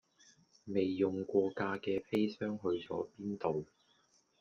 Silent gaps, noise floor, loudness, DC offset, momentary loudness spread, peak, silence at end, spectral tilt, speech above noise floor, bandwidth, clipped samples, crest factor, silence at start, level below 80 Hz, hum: none; -72 dBFS; -36 LUFS; under 0.1%; 8 LU; -18 dBFS; 0.75 s; -7.5 dB/octave; 37 dB; 7 kHz; under 0.1%; 18 dB; 0.65 s; -76 dBFS; none